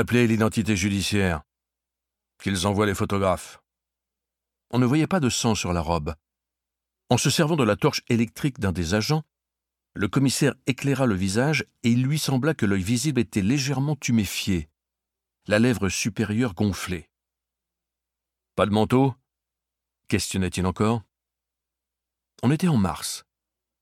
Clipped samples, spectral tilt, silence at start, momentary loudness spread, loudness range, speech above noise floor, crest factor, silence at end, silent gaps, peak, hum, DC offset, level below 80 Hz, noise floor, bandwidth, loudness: under 0.1%; -5 dB/octave; 0 s; 8 LU; 4 LU; 64 dB; 20 dB; 0.6 s; none; -4 dBFS; none; under 0.1%; -50 dBFS; -87 dBFS; 16.5 kHz; -24 LUFS